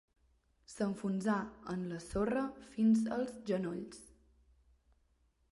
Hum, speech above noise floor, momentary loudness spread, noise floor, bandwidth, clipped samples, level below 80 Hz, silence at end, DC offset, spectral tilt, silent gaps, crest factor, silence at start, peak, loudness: none; 39 dB; 13 LU; -74 dBFS; 11.5 kHz; under 0.1%; -62 dBFS; 1.5 s; under 0.1%; -7 dB/octave; none; 16 dB; 0.7 s; -22 dBFS; -36 LUFS